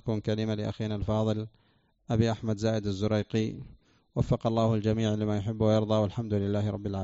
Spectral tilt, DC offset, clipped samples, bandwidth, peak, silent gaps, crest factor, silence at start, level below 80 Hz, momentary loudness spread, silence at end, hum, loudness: -7.5 dB/octave; under 0.1%; under 0.1%; 7.8 kHz; -12 dBFS; none; 18 dB; 0.05 s; -50 dBFS; 7 LU; 0 s; none; -29 LUFS